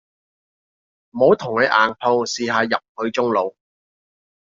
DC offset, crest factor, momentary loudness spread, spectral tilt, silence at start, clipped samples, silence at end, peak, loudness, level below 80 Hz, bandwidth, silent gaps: under 0.1%; 20 dB; 8 LU; -2.5 dB/octave; 1.15 s; under 0.1%; 0.95 s; -2 dBFS; -19 LUFS; -66 dBFS; 7.6 kHz; 2.89-2.95 s